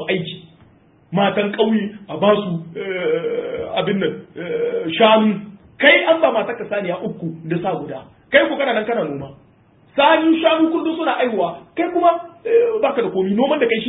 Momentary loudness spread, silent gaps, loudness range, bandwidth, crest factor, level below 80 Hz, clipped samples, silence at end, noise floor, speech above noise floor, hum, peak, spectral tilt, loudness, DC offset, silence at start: 13 LU; none; 4 LU; 4 kHz; 18 dB; -60 dBFS; under 0.1%; 0 s; -52 dBFS; 35 dB; none; 0 dBFS; -10.5 dB/octave; -18 LUFS; under 0.1%; 0 s